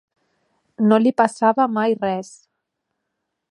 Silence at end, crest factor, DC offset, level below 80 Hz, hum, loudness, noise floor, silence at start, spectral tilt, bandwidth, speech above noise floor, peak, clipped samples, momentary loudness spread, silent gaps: 1.25 s; 20 dB; under 0.1%; -72 dBFS; none; -18 LUFS; -78 dBFS; 0.8 s; -6.5 dB/octave; 11 kHz; 60 dB; -2 dBFS; under 0.1%; 10 LU; none